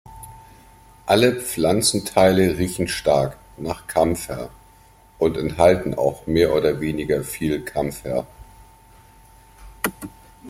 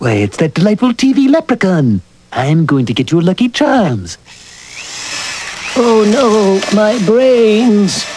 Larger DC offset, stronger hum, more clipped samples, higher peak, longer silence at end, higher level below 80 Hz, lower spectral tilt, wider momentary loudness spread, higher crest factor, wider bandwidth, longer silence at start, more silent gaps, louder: second, under 0.1% vs 0.1%; neither; neither; about the same, 0 dBFS vs 0 dBFS; about the same, 0 s vs 0 s; about the same, -44 dBFS vs -48 dBFS; about the same, -4.5 dB/octave vs -5.5 dB/octave; first, 16 LU vs 12 LU; first, 20 dB vs 12 dB; first, 16.5 kHz vs 11 kHz; about the same, 0.05 s vs 0 s; neither; second, -21 LUFS vs -11 LUFS